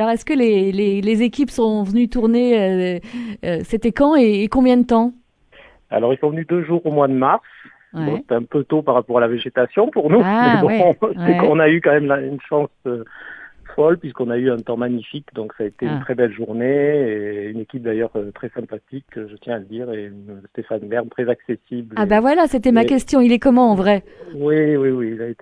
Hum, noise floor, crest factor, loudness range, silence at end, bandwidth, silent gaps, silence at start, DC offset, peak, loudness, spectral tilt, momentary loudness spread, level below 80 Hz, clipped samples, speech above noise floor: none; -49 dBFS; 16 dB; 9 LU; 0.1 s; 11 kHz; none; 0 s; under 0.1%; -2 dBFS; -17 LUFS; -7.5 dB/octave; 15 LU; -46 dBFS; under 0.1%; 31 dB